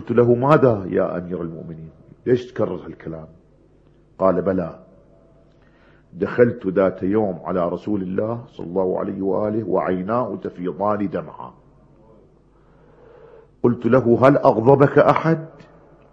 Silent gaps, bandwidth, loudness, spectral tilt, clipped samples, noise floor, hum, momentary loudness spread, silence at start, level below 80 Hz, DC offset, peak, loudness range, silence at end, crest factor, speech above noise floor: none; 7.4 kHz; -19 LUFS; -9.5 dB/octave; under 0.1%; -53 dBFS; none; 17 LU; 0 s; -54 dBFS; under 0.1%; 0 dBFS; 10 LU; 0.65 s; 20 dB; 34 dB